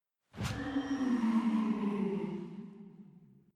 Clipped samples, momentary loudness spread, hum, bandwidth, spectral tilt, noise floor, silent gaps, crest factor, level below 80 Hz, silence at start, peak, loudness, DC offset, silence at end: under 0.1%; 21 LU; none; 12 kHz; -7 dB/octave; -59 dBFS; none; 14 dB; -60 dBFS; 0.35 s; -20 dBFS; -34 LUFS; under 0.1%; 0.3 s